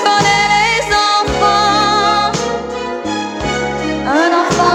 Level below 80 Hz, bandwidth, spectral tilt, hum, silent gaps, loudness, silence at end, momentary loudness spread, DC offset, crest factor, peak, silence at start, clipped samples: -36 dBFS; 14.5 kHz; -3.5 dB/octave; none; none; -13 LUFS; 0 s; 9 LU; under 0.1%; 14 dB; 0 dBFS; 0 s; under 0.1%